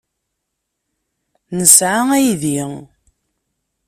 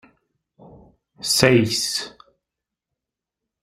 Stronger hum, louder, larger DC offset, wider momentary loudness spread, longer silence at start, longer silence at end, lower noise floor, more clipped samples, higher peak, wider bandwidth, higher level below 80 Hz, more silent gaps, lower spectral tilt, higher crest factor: neither; first, -12 LUFS vs -19 LUFS; neither; first, 19 LU vs 15 LU; first, 1.5 s vs 1.2 s; second, 1.05 s vs 1.55 s; second, -76 dBFS vs -86 dBFS; first, 0.1% vs under 0.1%; about the same, 0 dBFS vs 0 dBFS; about the same, 16 kHz vs 16 kHz; about the same, -56 dBFS vs -56 dBFS; neither; about the same, -3 dB/octave vs -3.5 dB/octave; second, 18 dB vs 24 dB